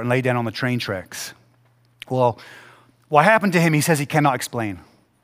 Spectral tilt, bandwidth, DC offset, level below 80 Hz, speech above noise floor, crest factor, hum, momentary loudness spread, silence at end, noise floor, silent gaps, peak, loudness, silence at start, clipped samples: -5.5 dB/octave; 16 kHz; under 0.1%; -62 dBFS; 39 dB; 20 dB; none; 17 LU; 0.4 s; -58 dBFS; none; 0 dBFS; -20 LUFS; 0 s; under 0.1%